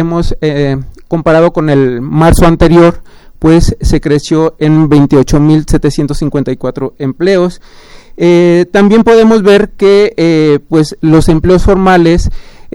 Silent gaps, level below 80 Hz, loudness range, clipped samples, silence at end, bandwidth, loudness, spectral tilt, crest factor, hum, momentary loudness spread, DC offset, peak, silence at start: none; -20 dBFS; 4 LU; 0.9%; 0.05 s; 16.5 kHz; -8 LUFS; -7 dB/octave; 8 dB; none; 8 LU; under 0.1%; 0 dBFS; 0 s